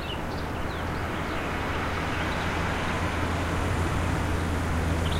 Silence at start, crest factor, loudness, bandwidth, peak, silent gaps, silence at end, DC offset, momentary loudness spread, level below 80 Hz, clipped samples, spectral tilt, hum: 0 s; 16 dB; -29 LUFS; 16 kHz; -12 dBFS; none; 0 s; under 0.1%; 4 LU; -36 dBFS; under 0.1%; -5.5 dB/octave; none